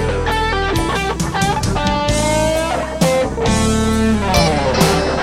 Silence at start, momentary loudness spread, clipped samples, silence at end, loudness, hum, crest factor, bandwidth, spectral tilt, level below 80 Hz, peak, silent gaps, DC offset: 0 s; 4 LU; under 0.1%; 0 s; -16 LUFS; none; 16 dB; 16 kHz; -4.5 dB/octave; -26 dBFS; 0 dBFS; none; 0.5%